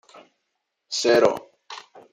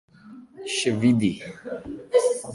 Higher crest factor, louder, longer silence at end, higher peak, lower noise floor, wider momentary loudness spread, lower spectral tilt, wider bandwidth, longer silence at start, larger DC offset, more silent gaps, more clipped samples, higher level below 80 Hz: about the same, 22 dB vs 18 dB; about the same, -21 LUFS vs -23 LUFS; first, 0.35 s vs 0 s; first, -4 dBFS vs -8 dBFS; first, -78 dBFS vs -46 dBFS; first, 22 LU vs 15 LU; second, -3 dB/octave vs -5 dB/octave; first, 15.5 kHz vs 11.5 kHz; first, 0.9 s vs 0.25 s; neither; neither; neither; second, -66 dBFS vs -58 dBFS